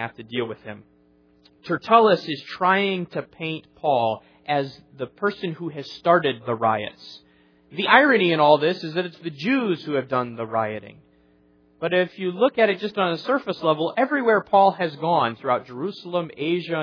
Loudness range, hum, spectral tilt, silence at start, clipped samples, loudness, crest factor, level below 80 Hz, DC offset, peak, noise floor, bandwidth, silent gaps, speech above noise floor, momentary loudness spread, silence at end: 5 LU; none; -7 dB/octave; 0 s; under 0.1%; -22 LUFS; 22 dB; -70 dBFS; under 0.1%; 0 dBFS; -58 dBFS; 5.4 kHz; none; 36 dB; 15 LU; 0 s